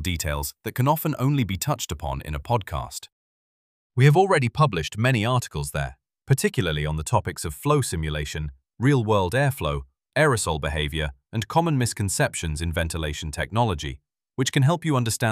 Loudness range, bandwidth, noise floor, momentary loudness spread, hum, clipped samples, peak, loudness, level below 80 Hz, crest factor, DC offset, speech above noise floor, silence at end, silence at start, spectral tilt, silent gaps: 3 LU; 16 kHz; under -90 dBFS; 11 LU; none; under 0.1%; -6 dBFS; -24 LUFS; -40 dBFS; 18 dB; under 0.1%; over 67 dB; 0 s; 0 s; -5 dB/octave; 3.12-3.90 s